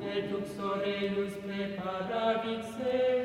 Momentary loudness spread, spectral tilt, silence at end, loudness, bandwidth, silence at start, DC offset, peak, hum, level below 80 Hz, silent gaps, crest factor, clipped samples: 6 LU; -6 dB/octave; 0 s; -33 LUFS; 15 kHz; 0 s; under 0.1%; -18 dBFS; none; -64 dBFS; none; 14 dB; under 0.1%